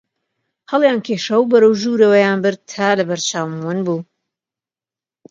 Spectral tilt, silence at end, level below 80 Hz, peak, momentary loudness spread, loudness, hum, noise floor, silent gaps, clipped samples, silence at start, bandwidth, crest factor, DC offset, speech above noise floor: -4.5 dB/octave; 1.25 s; -68 dBFS; 0 dBFS; 10 LU; -16 LUFS; none; under -90 dBFS; none; under 0.1%; 0.7 s; 7.8 kHz; 16 dB; under 0.1%; over 75 dB